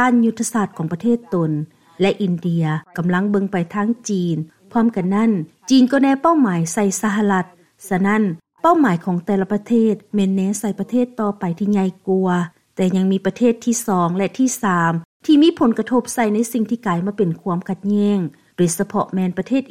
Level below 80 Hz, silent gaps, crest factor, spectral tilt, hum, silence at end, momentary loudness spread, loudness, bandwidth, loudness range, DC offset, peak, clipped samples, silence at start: -60 dBFS; 15.05-15.20 s; 14 dB; -6 dB/octave; none; 0.05 s; 7 LU; -19 LUFS; 16 kHz; 3 LU; 0.2%; -4 dBFS; under 0.1%; 0 s